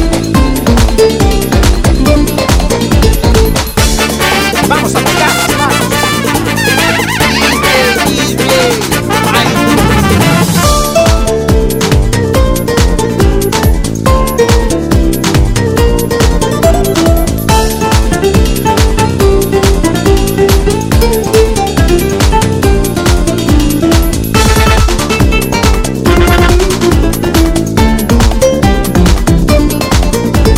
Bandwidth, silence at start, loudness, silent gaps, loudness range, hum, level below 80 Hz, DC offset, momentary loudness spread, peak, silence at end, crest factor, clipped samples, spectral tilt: 16.5 kHz; 0 s; -9 LUFS; none; 1 LU; none; -14 dBFS; under 0.1%; 3 LU; 0 dBFS; 0 s; 8 dB; 2%; -5 dB/octave